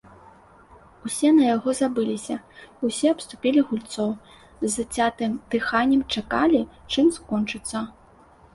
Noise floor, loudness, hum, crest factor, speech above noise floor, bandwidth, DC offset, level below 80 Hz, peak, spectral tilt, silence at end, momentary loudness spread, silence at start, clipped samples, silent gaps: -52 dBFS; -23 LUFS; none; 16 dB; 30 dB; 11.5 kHz; under 0.1%; -54 dBFS; -8 dBFS; -4 dB/octave; 0.65 s; 11 LU; 1.05 s; under 0.1%; none